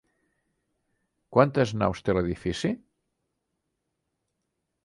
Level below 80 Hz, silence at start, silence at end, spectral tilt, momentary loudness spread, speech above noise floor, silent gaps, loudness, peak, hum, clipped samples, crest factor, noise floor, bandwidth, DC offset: -52 dBFS; 1.3 s; 2.1 s; -6.5 dB/octave; 8 LU; 56 dB; none; -26 LUFS; -4 dBFS; none; under 0.1%; 26 dB; -81 dBFS; 11.5 kHz; under 0.1%